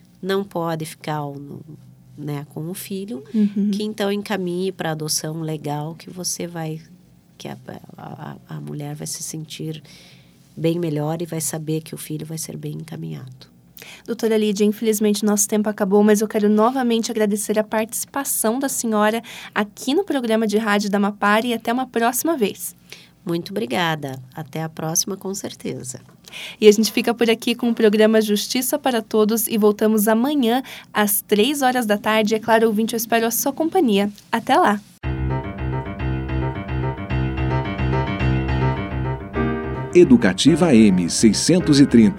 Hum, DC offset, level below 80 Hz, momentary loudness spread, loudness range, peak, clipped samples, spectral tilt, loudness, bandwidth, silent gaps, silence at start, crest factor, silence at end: none; under 0.1%; -38 dBFS; 16 LU; 10 LU; 0 dBFS; under 0.1%; -5 dB/octave; -20 LUFS; 18.5 kHz; none; 0.2 s; 20 dB; 0 s